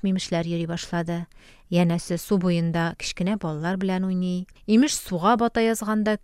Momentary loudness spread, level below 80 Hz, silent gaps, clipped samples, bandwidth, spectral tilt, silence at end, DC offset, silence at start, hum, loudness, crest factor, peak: 7 LU; -50 dBFS; none; under 0.1%; 15.5 kHz; -5.5 dB/octave; 0.05 s; under 0.1%; 0.05 s; none; -24 LUFS; 16 dB; -8 dBFS